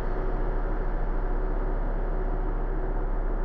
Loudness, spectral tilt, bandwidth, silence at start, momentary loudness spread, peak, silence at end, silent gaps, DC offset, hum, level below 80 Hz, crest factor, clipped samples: -32 LUFS; -10 dB/octave; 2.5 kHz; 0 s; 1 LU; -16 dBFS; 0 s; none; under 0.1%; none; -26 dBFS; 10 dB; under 0.1%